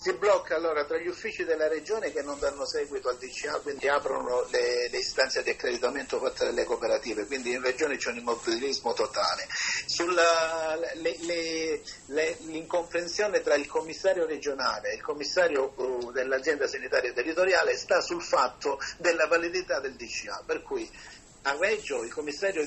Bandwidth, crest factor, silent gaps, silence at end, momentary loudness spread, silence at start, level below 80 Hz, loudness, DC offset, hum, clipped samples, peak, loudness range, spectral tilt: 8.6 kHz; 20 dB; none; 0 s; 8 LU; 0 s; -60 dBFS; -28 LUFS; under 0.1%; none; under 0.1%; -10 dBFS; 3 LU; -2 dB/octave